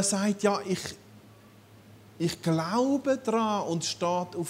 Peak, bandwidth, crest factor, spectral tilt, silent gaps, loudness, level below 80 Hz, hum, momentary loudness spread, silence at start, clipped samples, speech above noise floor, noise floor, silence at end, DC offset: -12 dBFS; 16 kHz; 18 dB; -4.5 dB/octave; none; -28 LUFS; -68 dBFS; none; 7 LU; 0 s; under 0.1%; 26 dB; -54 dBFS; 0 s; under 0.1%